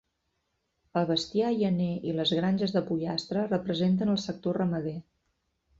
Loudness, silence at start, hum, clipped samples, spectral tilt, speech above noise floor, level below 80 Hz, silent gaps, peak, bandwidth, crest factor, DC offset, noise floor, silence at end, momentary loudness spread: -29 LUFS; 0.95 s; none; under 0.1%; -6.5 dB/octave; 50 dB; -64 dBFS; none; -14 dBFS; 7.8 kHz; 16 dB; under 0.1%; -78 dBFS; 0.8 s; 5 LU